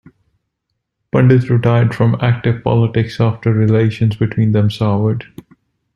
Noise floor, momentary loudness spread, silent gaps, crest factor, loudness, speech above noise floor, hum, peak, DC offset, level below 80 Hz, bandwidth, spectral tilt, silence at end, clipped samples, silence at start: -74 dBFS; 5 LU; none; 14 dB; -14 LUFS; 60 dB; none; -2 dBFS; under 0.1%; -46 dBFS; 6.2 kHz; -9 dB/octave; 0.7 s; under 0.1%; 1.15 s